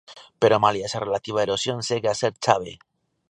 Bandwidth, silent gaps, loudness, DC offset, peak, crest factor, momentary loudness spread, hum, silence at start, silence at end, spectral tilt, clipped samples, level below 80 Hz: 10.5 kHz; none; -23 LUFS; under 0.1%; -2 dBFS; 22 dB; 8 LU; none; 0.1 s; 0.55 s; -4 dB/octave; under 0.1%; -60 dBFS